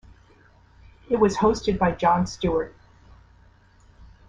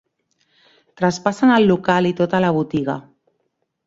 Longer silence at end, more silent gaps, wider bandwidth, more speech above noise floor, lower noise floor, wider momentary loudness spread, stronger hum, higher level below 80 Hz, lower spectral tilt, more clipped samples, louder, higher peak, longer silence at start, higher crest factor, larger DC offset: second, 0.25 s vs 0.85 s; neither; first, 9.8 kHz vs 7.8 kHz; second, 33 dB vs 55 dB; second, -55 dBFS vs -71 dBFS; about the same, 8 LU vs 9 LU; neither; first, -44 dBFS vs -58 dBFS; about the same, -6 dB/octave vs -6.5 dB/octave; neither; second, -23 LUFS vs -18 LUFS; second, -6 dBFS vs -2 dBFS; about the same, 1.1 s vs 1 s; about the same, 18 dB vs 18 dB; neither